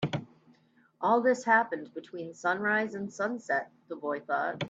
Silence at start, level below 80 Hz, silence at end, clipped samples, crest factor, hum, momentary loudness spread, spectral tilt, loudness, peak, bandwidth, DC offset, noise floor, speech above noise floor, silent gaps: 0 s; -76 dBFS; 0 s; under 0.1%; 20 dB; none; 14 LU; -5.5 dB/octave; -30 LUFS; -12 dBFS; 8 kHz; under 0.1%; -64 dBFS; 34 dB; none